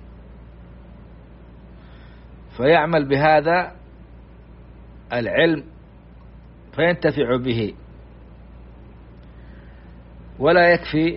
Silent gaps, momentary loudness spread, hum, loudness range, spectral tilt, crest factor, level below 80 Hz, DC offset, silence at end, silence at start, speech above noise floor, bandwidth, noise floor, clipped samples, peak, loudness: none; 13 LU; none; 5 LU; -4 dB/octave; 20 dB; -44 dBFS; under 0.1%; 0 s; 0 s; 26 dB; 5.6 kHz; -44 dBFS; under 0.1%; -4 dBFS; -19 LUFS